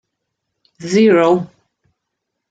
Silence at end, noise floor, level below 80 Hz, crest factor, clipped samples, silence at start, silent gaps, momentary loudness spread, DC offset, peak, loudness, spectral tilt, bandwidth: 1.05 s; -77 dBFS; -62 dBFS; 16 dB; under 0.1%; 0.8 s; none; 21 LU; under 0.1%; -2 dBFS; -13 LUFS; -6 dB/octave; 9.2 kHz